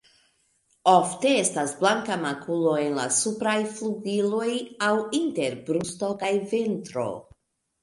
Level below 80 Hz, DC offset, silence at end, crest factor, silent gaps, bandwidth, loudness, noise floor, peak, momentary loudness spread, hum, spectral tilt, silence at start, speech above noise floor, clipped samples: -68 dBFS; under 0.1%; 0.6 s; 20 dB; none; 11.5 kHz; -25 LUFS; -68 dBFS; -4 dBFS; 9 LU; none; -3.5 dB/octave; 0.85 s; 43 dB; under 0.1%